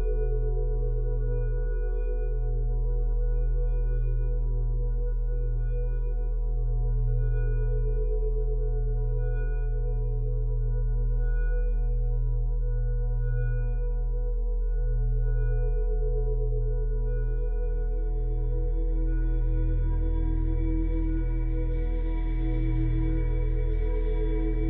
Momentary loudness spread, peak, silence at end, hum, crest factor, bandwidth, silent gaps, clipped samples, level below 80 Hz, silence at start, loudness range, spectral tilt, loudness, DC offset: 3 LU; -16 dBFS; 0 s; none; 8 dB; 2.6 kHz; none; under 0.1%; -26 dBFS; 0 s; 1 LU; -12.5 dB/octave; -30 LUFS; under 0.1%